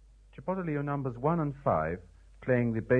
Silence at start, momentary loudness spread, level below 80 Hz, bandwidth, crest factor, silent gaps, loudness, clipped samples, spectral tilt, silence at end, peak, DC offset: 0.4 s; 11 LU; -52 dBFS; 4.3 kHz; 18 dB; none; -31 LUFS; under 0.1%; -10.5 dB/octave; 0 s; -12 dBFS; under 0.1%